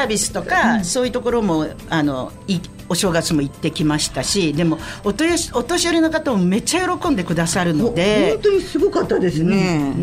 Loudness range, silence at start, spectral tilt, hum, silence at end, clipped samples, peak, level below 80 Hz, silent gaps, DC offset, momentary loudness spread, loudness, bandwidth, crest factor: 3 LU; 0 s; -4.5 dB/octave; none; 0 s; under 0.1%; -6 dBFS; -40 dBFS; none; under 0.1%; 6 LU; -18 LUFS; 16 kHz; 14 dB